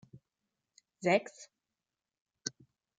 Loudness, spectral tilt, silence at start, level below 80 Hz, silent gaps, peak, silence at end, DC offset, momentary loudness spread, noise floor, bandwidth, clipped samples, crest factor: -34 LUFS; -4 dB/octave; 1 s; -84 dBFS; 2.21-2.25 s; -14 dBFS; 0.5 s; under 0.1%; 24 LU; under -90 dBFS; 9.4 kHz; under 0.1%; 24 dB